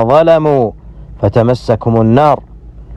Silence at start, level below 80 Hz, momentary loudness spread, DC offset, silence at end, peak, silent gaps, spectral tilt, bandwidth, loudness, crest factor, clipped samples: 0 s; -34 dBFS; 9 LU; under 0.1%; 0 s; 0 dBFS; none; -8.5 dB/octave; 9 kHz; -11 LUFS; 12 dB; under 0.1%